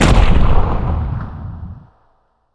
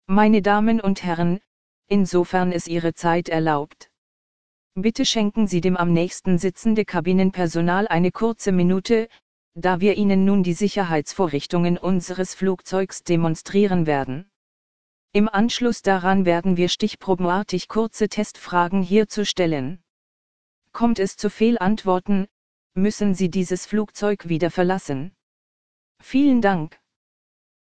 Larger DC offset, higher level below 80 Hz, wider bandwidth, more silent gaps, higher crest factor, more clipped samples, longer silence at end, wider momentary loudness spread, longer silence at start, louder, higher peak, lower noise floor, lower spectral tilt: second, under 0.1% vs 2%; first, -16 dBFS vs -48 dBFS; first, 11 kHz vs 9.4 kHz; second, none vs 1.47-1.82 s, 3.98-4.71 s, 9.22-9.52 s, 14.36-15.08 s, 19.90-20.62 s, 22.31-22.70 s, 25.23-25.95 s; about the same, 14 dB vs 18 dB; neither; about the same, 0.75 s vs 0.65 s; first, 20 LU vs 7 LU; about the same, 0 s vs 0 s; first, -17 LUFS vs -21 LUFS; about the same, 0 dBFS vs -2 dBFS; second, -58 dBFS vs under -90 dBFS; about the same, -6 dB/octave vs -6 dB/octave